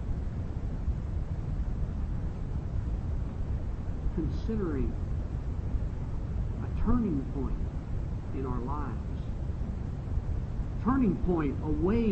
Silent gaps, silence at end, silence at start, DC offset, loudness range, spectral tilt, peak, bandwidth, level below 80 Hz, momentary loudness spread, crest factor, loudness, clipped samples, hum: none; 0 s; 0 s; under 0.1%; 3 LU; -9.5 dB/octave; -14 dBFS; 8 kHz; -34 dBFS; 8 LU; 16 dB; -33 LUFS; under 0.1%; none